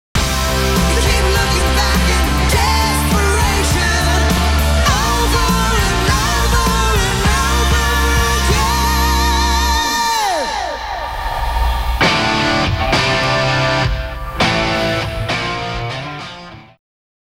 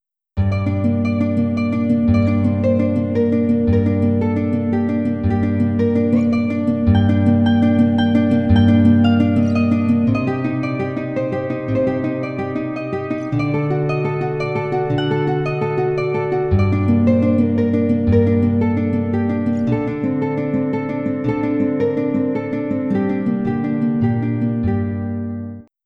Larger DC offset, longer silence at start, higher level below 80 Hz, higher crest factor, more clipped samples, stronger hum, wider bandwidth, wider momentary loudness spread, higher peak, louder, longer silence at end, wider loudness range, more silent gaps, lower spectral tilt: neither; second, 0.15 s vs 0.35 s; first, -20 dBFS vs -40 dBFS; about the same, 12 dB vs 14 dB; neither; neither; first, 16.5 kHz vs 6.2 kHz; about the same, 7 LU vs 7 LU; about the same, -4 dBFS vs -2 dBFS; first, -15 LUFS vs -18 LUFS; first, 0.65 s vs 0.25 s; second, 2 LU vs 6 LU; neither; second, -4 dB/octave vs -9.5 dB/octave